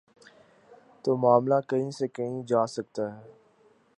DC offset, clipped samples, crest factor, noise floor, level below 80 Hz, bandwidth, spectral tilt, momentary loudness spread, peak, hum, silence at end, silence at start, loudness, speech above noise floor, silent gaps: under 0.1%; under 0.1%; 22 dB; -62 dBFS; -76 dBFS; 11 kHz; -7 dB/octave; 12 LU; -8 dBFS; none; 0.7 s; 1.05 s; -27 LUFS; 36 dB; none